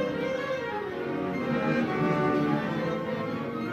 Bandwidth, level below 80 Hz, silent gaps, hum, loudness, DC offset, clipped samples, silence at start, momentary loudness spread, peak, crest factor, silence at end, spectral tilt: 13.5 kHz; -60 dBFS; none; none; -29 LUFS; under 0.1%; under 0.1%; 0 s; 7 LU; -12 dBFS; 16 dB; 0 s; -7.5 dB/octave